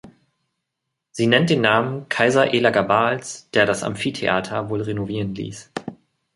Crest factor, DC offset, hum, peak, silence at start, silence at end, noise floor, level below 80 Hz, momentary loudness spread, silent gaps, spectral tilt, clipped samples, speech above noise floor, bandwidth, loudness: 20 dB; under 0.1%; none; -2 dBFS; 0.05 s; 0.4 s; -80 dBFS; -56 dBFS; 15 LU; none; -5 dB/octave; under 0.1%; 60 dB; 11.5 kHz; -20 LUFS